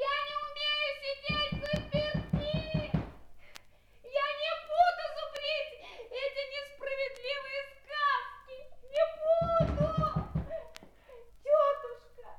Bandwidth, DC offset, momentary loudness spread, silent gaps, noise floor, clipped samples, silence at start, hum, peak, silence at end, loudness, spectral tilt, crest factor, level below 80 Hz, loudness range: 13.5 kHz; under 0.1%; 15 LU; none; -56 dBFS; under 0.1%; 0 s; none; -14 dBFS; 0 s; -32 LUFS; -6 dB/octave; 20 dB; -48 dBFS; 4 LU